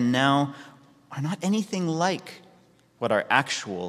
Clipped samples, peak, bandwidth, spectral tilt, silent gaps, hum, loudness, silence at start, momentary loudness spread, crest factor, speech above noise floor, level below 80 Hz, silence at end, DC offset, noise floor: under 0.1%; -4 dBFS; 14.5 kHz; -5 dB/octave; none; none; -25 LUFS; 0 s; 13 LU; 22 dB; 33 dB; -70 dBFS; 0 s; under 0.1%; -58 dBFS